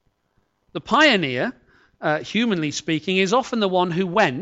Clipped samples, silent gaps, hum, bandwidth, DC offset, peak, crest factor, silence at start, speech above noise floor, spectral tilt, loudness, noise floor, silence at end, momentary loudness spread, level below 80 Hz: under 0.1%; none; none; 8.2 kHz; under 0.1%; -4 dBFS; 16 dB; 0.75 s; 47 dB; -4.5 dB/octave; -20 LUFS; -68 dBFS; 0 s; 11 LU; -60 dBFS